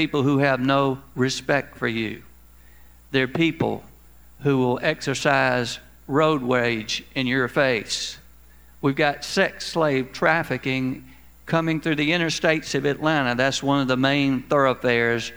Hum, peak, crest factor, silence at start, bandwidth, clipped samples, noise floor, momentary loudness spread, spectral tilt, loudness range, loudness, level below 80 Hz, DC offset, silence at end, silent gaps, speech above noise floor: none; -4 dBFS; 20 dB; 0 s; over 20 kHz; under 0.1%; -51 dBFS; 7 LU; -5 dB/octave; 4 LU; -22 LUFS; -52 dBFS; 0.2%; 0 s; none; 29 dB